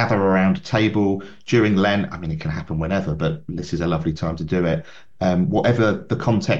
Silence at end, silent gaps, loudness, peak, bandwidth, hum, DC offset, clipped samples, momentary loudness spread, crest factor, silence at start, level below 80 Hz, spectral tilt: 0 s; none; -21 LUFS; -6 dBFS; 7.6 kHz; none; 0.8%; under 0.1%; 9 LU; 16 dB; 0 s; -44 dBFS; -7 dB/octave